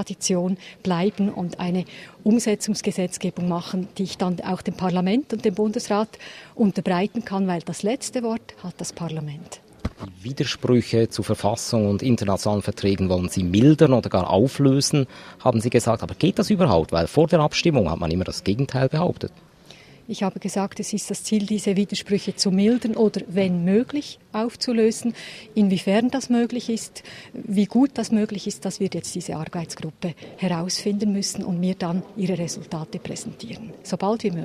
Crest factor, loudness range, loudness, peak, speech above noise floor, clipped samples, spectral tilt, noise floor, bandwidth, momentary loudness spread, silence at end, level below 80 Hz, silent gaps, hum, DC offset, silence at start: 20 dB; 7 LU; -23 LUFS; -2 dBFS; 25 dB; under 0.1%; -5.5 dB/octave; -48 dBFS; 14.5 kHz; 13 LU; 0 s; -50 dBFS; none; none; under 0.1%; 0 s